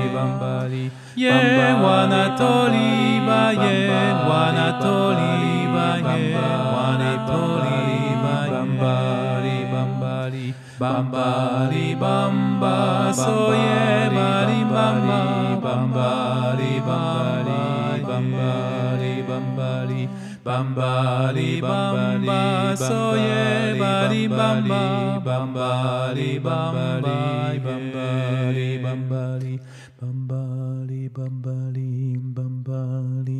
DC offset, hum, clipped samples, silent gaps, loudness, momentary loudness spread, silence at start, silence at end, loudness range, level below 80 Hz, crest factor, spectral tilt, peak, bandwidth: under 0.1%; none; under 0.1%; none; -21 LUFS; 9 LU; 0 s; 0 s; 8 LU; -64 dBFS; 18 dB; -6.5 dB/octave; -2 dBFS; 12 kHz